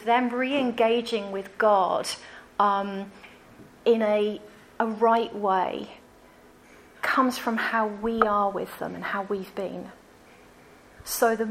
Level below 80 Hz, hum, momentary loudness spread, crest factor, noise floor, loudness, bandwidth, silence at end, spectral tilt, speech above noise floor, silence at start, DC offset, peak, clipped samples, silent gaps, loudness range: -62 dBFS; none; 13 LU; 22 dB; -53 dBFS; -26 LUFS; 16 kHz; 0 s; -4 dB/octave; 28 dB; 0 s; under 0.1%; -4 dBFS; under 0.1%; none; 3 LU